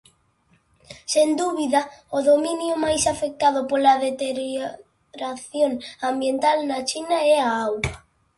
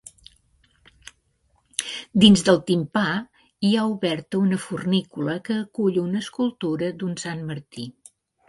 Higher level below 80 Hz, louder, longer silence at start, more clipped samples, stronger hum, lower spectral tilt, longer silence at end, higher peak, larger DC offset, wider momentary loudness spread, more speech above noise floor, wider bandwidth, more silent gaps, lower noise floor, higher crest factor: first, -50 dBFS vs -58 dBFS; about the same, -22 LUFS vs -23 LUFS; second, 0.9 s vs 1.8 s; neither; neither; second, -3.5 dB/octave vs -5 dB/octave; second, 0.4 s vs 0.6 s; second, -6 dBFS vs -2 dBFS; neither; second, 11 LU vs 14 LU; about the same, 41 dB vs 44 dB; about the same, 11.5 kHz vs 11.5 kHz; neither; about the same, -63 dBFS vs -66 dBFS; about the same, 18 dB vs 22 dB